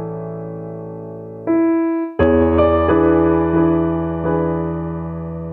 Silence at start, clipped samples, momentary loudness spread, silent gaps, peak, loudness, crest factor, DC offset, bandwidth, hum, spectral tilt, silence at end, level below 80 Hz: 0 s; under 0.1%; 16 LU; none; -4 dBFS; -17 LUFS; 14 dB; under 0.1%; 3.8 kHz; none; -11.5 dB/octave; 0 s; -38 dBFS